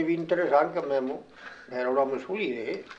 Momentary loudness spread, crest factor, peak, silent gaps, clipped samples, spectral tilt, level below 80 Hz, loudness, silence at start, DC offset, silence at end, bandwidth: 15 LU; 18 dB; -10 dBFS; none; under 0.1%; -7 dB/octave; -70 dBFS; -28 LUFS; 0 s; under 0.1%; 0 s; 7.6 kHz